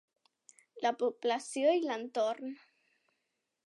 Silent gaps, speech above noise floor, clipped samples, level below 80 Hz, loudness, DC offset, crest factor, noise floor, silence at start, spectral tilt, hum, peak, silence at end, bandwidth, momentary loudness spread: none; 52 dB; under 0.1%; under -90 dBFS; -33 LUFS; under 0.1%; 18 dB; -84 dBFS; 0.75 s; -2.5 dB/octave; none; -16 dBFS; 1.1 s; 11.5 kHz; 12 LU